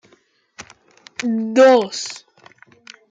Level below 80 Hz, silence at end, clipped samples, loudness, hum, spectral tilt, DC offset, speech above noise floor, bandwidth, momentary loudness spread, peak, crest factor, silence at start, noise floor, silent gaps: -70 dBFS; 0.9 s; under 0.1%; -16 LUFS; none; -3.5 dB/octave; under 0.1%; 43 dB; 9.2 kHz; 22 LU; -2 dBFS; 18 dB; 0.6 s; -58 dBFS; none